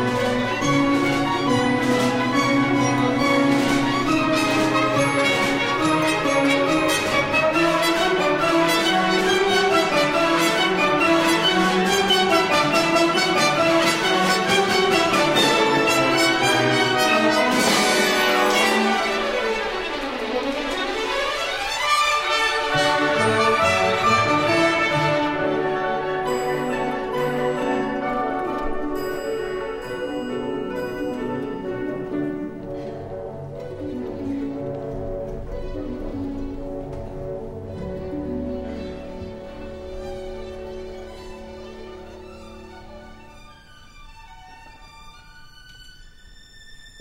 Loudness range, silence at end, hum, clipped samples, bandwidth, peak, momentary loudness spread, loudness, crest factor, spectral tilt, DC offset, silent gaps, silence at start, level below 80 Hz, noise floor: 14 LU; 0 s; none; under 0.1%; 16 kHz; -4 dBFS; 16 LU; -20 LUFS; 18 dB; -4 dB/octave; under 0.1%; none; 0 s; -42 dBFS; -45 dBFS